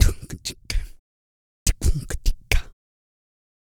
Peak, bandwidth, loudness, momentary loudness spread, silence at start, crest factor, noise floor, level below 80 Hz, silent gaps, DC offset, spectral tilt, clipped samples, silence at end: -2 dBFS; 19.5 kHz; -27 LUFS; 9 LU; 0 s; 22 dB; under -90 dBFS; -26 dBFS; 0.99-1.66 s; under 0.1%; -3.5 dB/octave; under 0.1%; 0.95 s